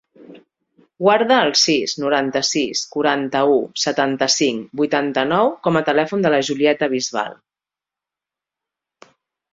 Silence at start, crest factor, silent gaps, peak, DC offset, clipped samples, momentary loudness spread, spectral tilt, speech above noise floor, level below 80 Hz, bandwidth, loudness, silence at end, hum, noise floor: 0.2 s; 18 dB; none; -2 dBFS; under 0.1%; under 0.1%; 6 LU; -3 dB/octave; 71 dB; -62 dBFS; 8 kHz; -18 LUFS; 2.2 s; none; -89 dBFS